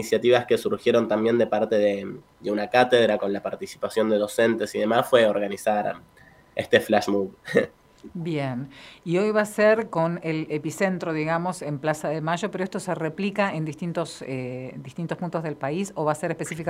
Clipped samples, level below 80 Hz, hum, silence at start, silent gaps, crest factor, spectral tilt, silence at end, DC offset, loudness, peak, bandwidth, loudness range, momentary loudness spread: under 0.1%; -64 dBFS; none; 0 s; none; 22 dB; -5.5 dB/octave; 0 s; under 0.1%; -24 LUFS; -2 dBFS; 16 kHz; 6 LU; 12 LU